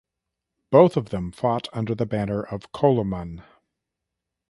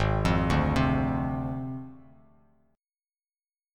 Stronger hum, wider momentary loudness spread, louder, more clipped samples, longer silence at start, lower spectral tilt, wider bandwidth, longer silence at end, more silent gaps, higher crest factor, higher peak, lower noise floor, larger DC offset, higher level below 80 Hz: neither; about the same, 16 LU vs 14 LU; first, -23 LUFS vs -27 LUFS; neither; first, 0.7 s vs 0 s; about the same, -8.5 dB/octave vs -7.5 dB/octave; about the same, 11.5 kHz vs 12.5 kHz; second, 1.1 s vs 1.75 s; neither; about the same, 22 dB vs 18 dB; first, -2 dBFS vs -10 dBFS; second, -84 dBFS vs under -90 dBFS; neither; second, -50 dBFS vs -38 dBFS